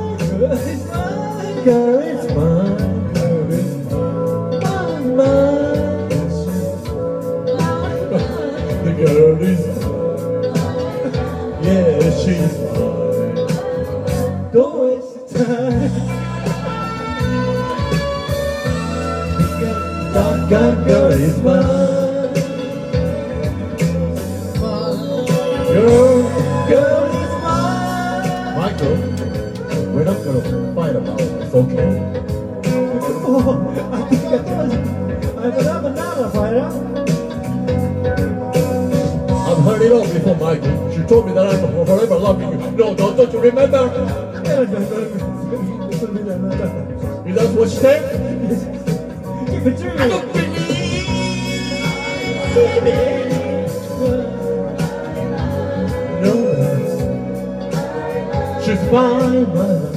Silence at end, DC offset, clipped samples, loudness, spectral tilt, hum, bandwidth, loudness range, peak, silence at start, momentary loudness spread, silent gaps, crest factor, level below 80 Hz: 0 s; under 0.1%; under 0.1%; -17 LUFS; -7 dB/octave; none; 15.5 kHz; 5 LU; 0 dBFS; 0 s; 9 LU; none; 16 dB; -36 dBFS